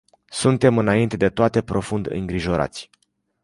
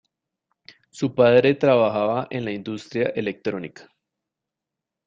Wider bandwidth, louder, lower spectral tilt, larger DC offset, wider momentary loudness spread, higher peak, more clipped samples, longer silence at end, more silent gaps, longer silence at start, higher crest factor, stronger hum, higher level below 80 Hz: first, 11.5 kHz vs 7.6 kHz; about the same, -21 LUFS vs -21 LUFS; about the same, -6 dB/octave vs -7 dB/octave; neither; second, 10 LU vs 14 LU; about the same, -2 dBFS vs -4 dBFS; neither; second, 0.6 s vs 1.25 s; neither; second, 0.3 s vs 0.95 s; about the same, 18 dB vs 20 dB; neither; first, -44 dBFS vs -64 dBFS